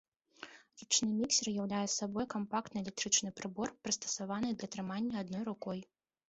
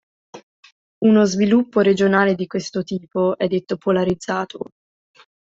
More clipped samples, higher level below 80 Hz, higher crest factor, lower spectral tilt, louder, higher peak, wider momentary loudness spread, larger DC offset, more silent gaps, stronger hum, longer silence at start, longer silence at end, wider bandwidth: neither; second, -72 dBFS vs -56 dBFS; first, 22 dB vs 16 dB; second, -2.5 dB/octave vs -6 dB/octave; second, -36 LUFS vs -19 LUFS; second, -16 dBFS vs -2 dBFS; first, 13 LU vs 10 LU; neither; second, none vs 0.43-0.63 s, 0.72-1.01 s; neither; about the same, 0.4 s vs 0.35 s; second, 0.45 s vs 0.8 s; about the same, 8.2 kHz vs 7.8 kHz